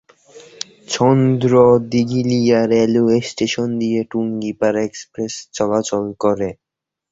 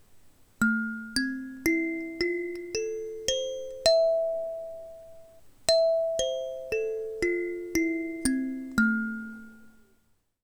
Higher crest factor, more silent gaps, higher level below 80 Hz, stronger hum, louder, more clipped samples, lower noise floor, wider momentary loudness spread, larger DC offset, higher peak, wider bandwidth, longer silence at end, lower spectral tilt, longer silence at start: second, 16 dB vs 24 dB; neither; about the same, -52 dBFS vs -54 dBFS; neither; first, -17 LUFS vs -28 LUFS; neither; second, -44 dBFS vs -67 dBFS; about the same, 13 LU vs 12 LU; neither; first, 0 dBFS vs -6 dBFS; second, 7.8 kHz vs over 20 kHz; second, 0.6 s vs 0.75 s; first, -6 dB/octave vs -3 dB/octave; first, 0.35 s vs 0.1 s